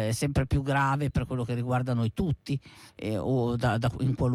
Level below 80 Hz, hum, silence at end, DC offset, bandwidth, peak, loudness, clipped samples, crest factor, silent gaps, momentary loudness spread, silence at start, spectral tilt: -44 dBFS; none; 0 s; under 0.1%; 14.5 kHz; -16 dBFS; -28 LUFS; under 0.1%; 12 dB; none; 7 LU; 0 s; -7 dB/octave